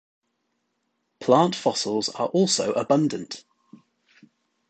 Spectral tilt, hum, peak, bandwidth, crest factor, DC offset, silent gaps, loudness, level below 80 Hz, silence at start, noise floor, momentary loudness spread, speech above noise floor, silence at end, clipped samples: -4.5 dB/octave; none; -4 dBFS; 9.2 kHz; 22 dB; under 0.1%; none; -23 LUFS; -70 dBFS; 1.2 s; -75 dBFS; 13 LU; 53 dB; 1.3 s; under 0.1%